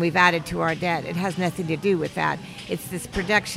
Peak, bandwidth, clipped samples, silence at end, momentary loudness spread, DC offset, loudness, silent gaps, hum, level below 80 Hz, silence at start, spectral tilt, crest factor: -4 dBFS; 16 kHz; under 0.1%; 0 s; 11 LU; under 0.1%; -24 LUFS; none; none; -48 dBFS; 0 s; -5 dB/octave; 20 dB